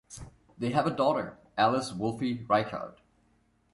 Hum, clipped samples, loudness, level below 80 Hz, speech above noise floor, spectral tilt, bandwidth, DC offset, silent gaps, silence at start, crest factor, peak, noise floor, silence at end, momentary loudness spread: none; under 0.1%; -29 LUFS; -60 dBFS; 40 dB; -6 dB/octave; 11.5 kHz; under 0.1%; none; 0.1 s; 20 dB; -10 dBFS; -68 dBFS; 0.85 s; 15 LU